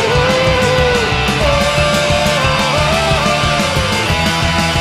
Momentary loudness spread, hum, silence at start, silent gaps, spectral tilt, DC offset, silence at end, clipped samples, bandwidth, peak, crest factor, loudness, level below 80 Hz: 2 LU; none; 0 s; none; -4 dB/octave; under 0.1%; 0 s; under 0.1%; 15.5 kHz; 0 dBFS; 12 dB; -13 LUFS; -26 dBFS